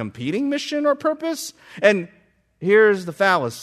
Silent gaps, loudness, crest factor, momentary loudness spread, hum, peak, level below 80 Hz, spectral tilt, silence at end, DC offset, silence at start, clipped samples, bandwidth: none; -20 LUFS; 18 dB; 13 LU; none; -2 dBFS; -68 dBFS; -4.5 dB/octave; 0 s; under 0.1%; 0 s; under 0.1%; 14 kHz